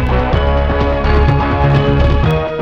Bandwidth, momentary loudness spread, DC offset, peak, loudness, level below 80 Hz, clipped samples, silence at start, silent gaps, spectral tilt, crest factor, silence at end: 6.2 kHz; 3 LU; under 0.1%; -2 dBFS; -13 LUFS; -16 dBFS; under 0.1%; 0 s; none; -8.5 dB/octave; 10 dB; 0 s